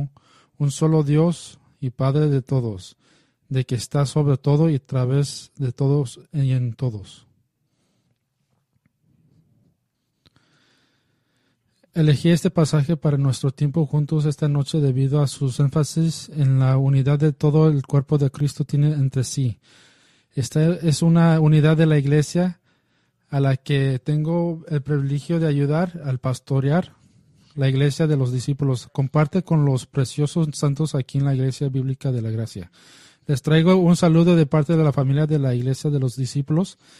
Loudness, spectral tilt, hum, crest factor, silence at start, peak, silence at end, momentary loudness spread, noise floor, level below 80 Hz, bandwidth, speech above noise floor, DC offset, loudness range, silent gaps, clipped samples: -20 LUFS; -7.5 dB/octave; none; 16 dB; 0 s; -4 dBFS; 0.25 s; 10 LU; -73 dBFS; -54 dBFS; 12 kHz; 53 dB; under 0.1%; 5 LU; none; under 0.1%